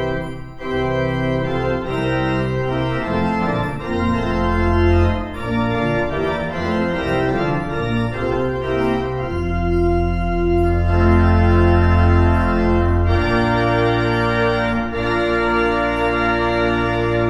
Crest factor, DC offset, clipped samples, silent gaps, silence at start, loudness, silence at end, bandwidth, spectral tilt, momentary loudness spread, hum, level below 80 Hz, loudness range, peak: 14 dB; under 0.1%; under 0.1%; none; 0 s; -18 LUFS; 0 s; 7.8 kHz; -8 dB/octave; 7 LU; none; -26 dBFS; 5 LU; -2 dBFS